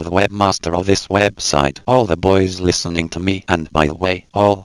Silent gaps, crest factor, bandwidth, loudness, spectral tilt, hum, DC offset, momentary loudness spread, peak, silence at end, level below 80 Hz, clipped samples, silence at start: none; 16 dB; 12.5 kHz; -16 LUFS; -4.5 dB/octave; none; under 0.1%; 5 LU; 0 dBFS; 0 s; -36 dBFS; under 0.1%; 0 s